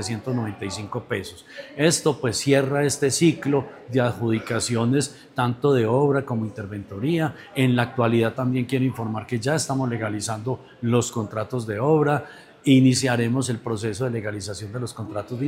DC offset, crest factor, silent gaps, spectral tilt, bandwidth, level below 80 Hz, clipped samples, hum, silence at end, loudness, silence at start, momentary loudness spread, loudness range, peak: under 0.1%; 18 dB; none; -5.5 dB/octave; 16 kHz; -62 dBFS; under 0.1%; none; 0 s; -23 LUFS; 0 s; 11 LU; 3 LU; -4 dBFS